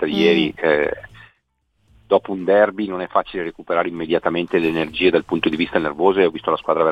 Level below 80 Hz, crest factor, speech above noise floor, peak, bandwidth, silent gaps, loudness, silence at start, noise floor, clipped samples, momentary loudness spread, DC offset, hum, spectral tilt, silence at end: -52 dBFS; 18 dB; 49 dB; -2 dBFS; 8.4 kHz; none; -19 LUFS; 0 s; -68 dBFS; under 0.1%; 6 LU; under 0.1%; none; -6.5 dB/octave; 0 s